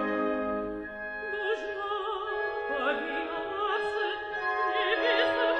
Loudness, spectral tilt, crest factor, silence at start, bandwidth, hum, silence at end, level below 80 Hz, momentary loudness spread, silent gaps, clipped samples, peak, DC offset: -30 LUFS; -4.5 dB/octave; 18 dB; 0 s; 9.2 kHz; none; 0 s; -60 dBFS; 8 LU; none; under 0.1%; -12 dBFS; under 0.1%